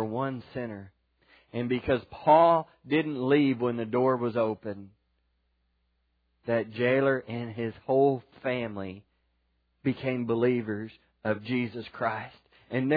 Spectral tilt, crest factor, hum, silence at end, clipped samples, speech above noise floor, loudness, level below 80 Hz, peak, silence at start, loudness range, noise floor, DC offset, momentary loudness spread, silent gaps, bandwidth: -10 dB/octave; 20 dB; none; 0 s; under 0.1%; 46 dB; -28 LUFS; -64 dBFS; -8 dBFS; 0 s; 6 LU; -74 dBFS; under 0.1%; 15 LU; none; 5 kHz